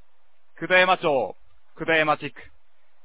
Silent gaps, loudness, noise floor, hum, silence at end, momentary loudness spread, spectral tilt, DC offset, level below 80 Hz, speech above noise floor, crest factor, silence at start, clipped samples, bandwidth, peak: none; -22 LUFS; -69 dBFS; none; 0.6 s; 16 LU; -8 dB/octave; 0.8%; -62 dBFS; 47 dB; 20 dB; 0.6 s; under 0.1%; 4 kHz; -4 dBFS